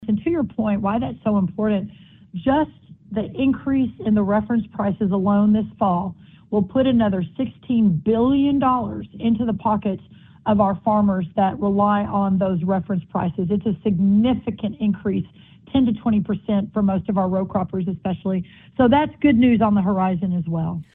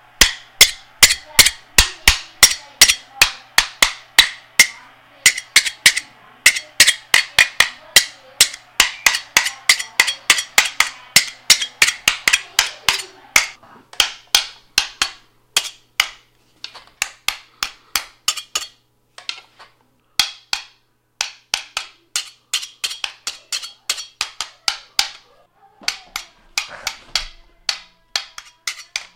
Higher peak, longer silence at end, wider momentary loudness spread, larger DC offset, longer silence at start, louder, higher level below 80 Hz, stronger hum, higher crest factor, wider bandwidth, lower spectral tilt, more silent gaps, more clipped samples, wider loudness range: second, -4 dBFS vs 0 dBFS; about the same, 0.1 s vs 0.1 s; second, 8 LU vs 15 LU; neither; second, 0 s vs 0.2 s; second, -21 LUFS vs -16 LUFS; second, -48 dBFS vs -38 dBFS; neither; about the same, 16 dB vs 20 dB; second, 3.9 kHz vs over 20 kHz; first, -11.5 dB/octave vs 1.5 dB/octave; neither; second, under 0.1% vs 0.2%; second, 3 LU vs 12 LU